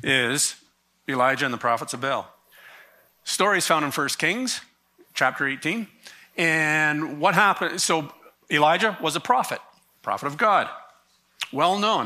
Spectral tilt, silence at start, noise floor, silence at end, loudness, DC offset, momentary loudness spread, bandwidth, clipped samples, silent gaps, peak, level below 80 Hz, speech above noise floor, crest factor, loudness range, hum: -2.5 dB/octave; 0.05 s; -60 dBFS; 0 s; -23 LUFS; under 0.1%; 15 LU; 15.5 kHz; under 0.1%; none; -4 dBFS; -74 dBFS; 37 dB; 20 dB; 3 LU; none